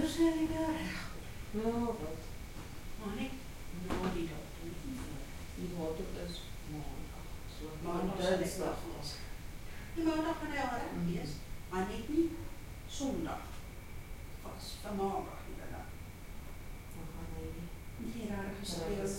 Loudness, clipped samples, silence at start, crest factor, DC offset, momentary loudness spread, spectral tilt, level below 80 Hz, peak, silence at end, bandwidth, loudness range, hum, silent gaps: -40 LUFS; under 0.1%; 0 s; 20 dB; under 0.1%; 14 LU; -5.5 dB/octave; -48 dBFS; -18 dBFS; 0 s; 16.5 kHz; 6 LU; none; none